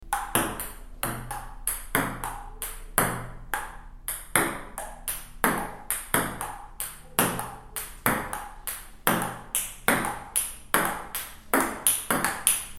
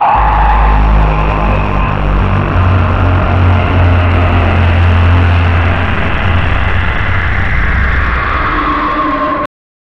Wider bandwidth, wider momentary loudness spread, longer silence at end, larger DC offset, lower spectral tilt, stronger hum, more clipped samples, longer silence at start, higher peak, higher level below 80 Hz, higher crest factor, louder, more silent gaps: first, 17 kHz vs 5.8 kHz; first, 12 LU vs 4 LU; second, 0 s vs 0.5 s; neither; second, -2.5 dB/octave vs -8 dB/octave; neither; neither; about the same, 0 s vs 0 s; about the same, 0 dBFS vs -2 dBFS; second, -44 dBFS vs -14 dBFS; first, 30 dB vs 8 dB; second, -28 LUFS vs -11 LUFS; neither